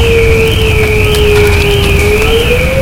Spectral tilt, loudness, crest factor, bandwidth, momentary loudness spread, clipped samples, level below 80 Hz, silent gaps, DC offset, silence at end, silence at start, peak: -5 dB/octave; -8 LUFS; 8 dB; 17.5 kHz; 2 LU; 0.8%; -14 dBFS; none; under 0.1%; 0 s; 0 s; 0 dBFS